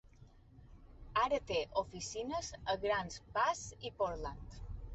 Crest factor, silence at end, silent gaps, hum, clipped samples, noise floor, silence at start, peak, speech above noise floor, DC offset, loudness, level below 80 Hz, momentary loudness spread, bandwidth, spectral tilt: 18 dB; 0 s; none; none; under 0.1%; -60 dBFS; 0.05 s; -20 dBFS; 22 dB; under 0.1%; -38 LUFS; -54 dBFS; 12 LU; 8.2 kHz; -3.5 dB/octave